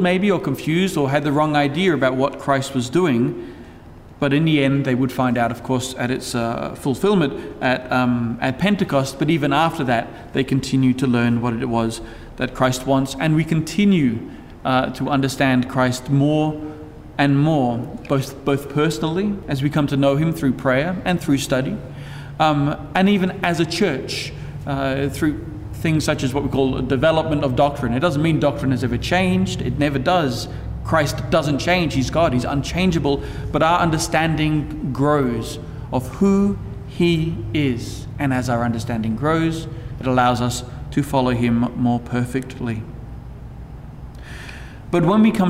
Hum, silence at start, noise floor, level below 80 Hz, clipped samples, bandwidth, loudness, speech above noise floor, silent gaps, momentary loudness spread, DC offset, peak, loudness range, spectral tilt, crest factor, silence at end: none; 0 s; -41 dBFS; -38 dBFS; under 0.1%; 16 kHz; -20 LUFS; 22 dB; none; 12 LU; under 0.1%; -4 dBFS; 2 LU; -6 dB/octave; 16 dB; 0 s